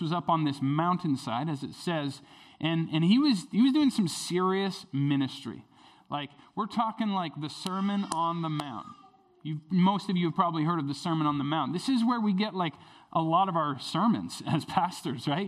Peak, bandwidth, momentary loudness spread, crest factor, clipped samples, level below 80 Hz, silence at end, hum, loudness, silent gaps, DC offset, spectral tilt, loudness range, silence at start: -10 dBFS; 13.5 kHz; 12 LU; 18 dB; under 0.1%; -72 dBFS; 0 s; none; -29 LUFS; none; under 0.1%; -6 dB/octave; 5 LU; 0 s